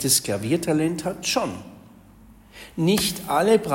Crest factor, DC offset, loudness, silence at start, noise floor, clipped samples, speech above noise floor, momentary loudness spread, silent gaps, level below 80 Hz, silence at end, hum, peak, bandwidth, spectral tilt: 18 dB; under 0.1%; -22 LUFS; 0 s; -49 dBFS; under 0.1%; 27 dB; 14 LU; none; -52 dBFS; 0 s; none; -6 dBFS; 16.5 kHz; -4 dB/octave